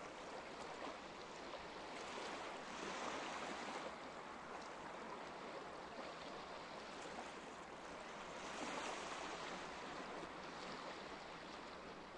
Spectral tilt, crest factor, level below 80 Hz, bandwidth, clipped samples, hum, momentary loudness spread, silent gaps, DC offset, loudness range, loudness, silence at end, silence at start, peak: -3 dB/octave; 16 dB; -74 dBFS; 11 kHz; under 0.1%; none; 6 LU; none; under 0.1%; 3 LU; -50 LUFS; 0 s; 0 s; -34 dBFS